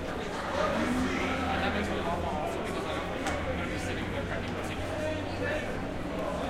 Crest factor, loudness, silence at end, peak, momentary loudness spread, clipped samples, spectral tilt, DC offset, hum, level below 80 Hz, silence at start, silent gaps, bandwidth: 16 dB; -32 LUFS; 0 s; -16 dBFS; 5 LU; under 0.1%; -5.5 dB/octave; under 0.1%; none; -44 dBFS; 0 s; none; 16.5 kHz